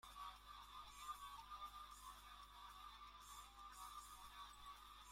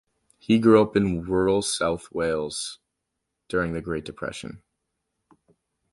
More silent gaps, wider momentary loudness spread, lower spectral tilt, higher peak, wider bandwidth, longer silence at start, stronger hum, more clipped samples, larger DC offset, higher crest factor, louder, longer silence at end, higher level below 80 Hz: neither; second, 5 LU vs 16 LU; second, -1 dB/octave vs -5 dB/octave; second, -40 dBFS vs -4 dBFS; first, 16.5 kHz vs 11.5 kHz; second, 0.05 s vs 0.5 s; first, 50 Hz at -70 dBFS vs none; neither; neither; about the same, 20 dB vs 20 dB; second, -58 LUFS vs -24 LUFS; second, 0 s vs 1.35 s; second, -70 dBFS vs -50 dBFS